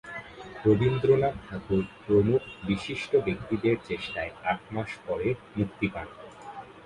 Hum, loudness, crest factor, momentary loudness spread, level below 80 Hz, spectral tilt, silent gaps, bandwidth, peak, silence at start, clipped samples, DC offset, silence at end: none; -28 LUFS; 18 dB; 17 LU; -52 dBFS; -7.5 dB/octave; none; 10.5 kHz; -10 dBFS; 0.05 s; under 0.1%; under 0.1%; 0.05 s